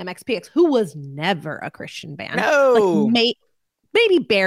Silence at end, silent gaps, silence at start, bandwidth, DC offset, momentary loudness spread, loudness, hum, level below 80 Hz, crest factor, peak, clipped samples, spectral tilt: 0 s; none; 0 s; 15 kHz; under 0.1%; 16 LU; -18 LUFS; none; -66 dBFS; 12 dB; -6 dBFS; under 0.1%; -5 dB/octave